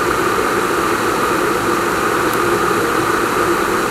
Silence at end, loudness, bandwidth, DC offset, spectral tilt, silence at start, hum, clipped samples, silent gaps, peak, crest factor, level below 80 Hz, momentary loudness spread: 0 s; -16 LUFS; 16 kHz; under 0.1%; -4 dB/octave; 0 s; none; under 0.1%; none; -2 dBFS; 14 dB; -40 dBFS; 1 LU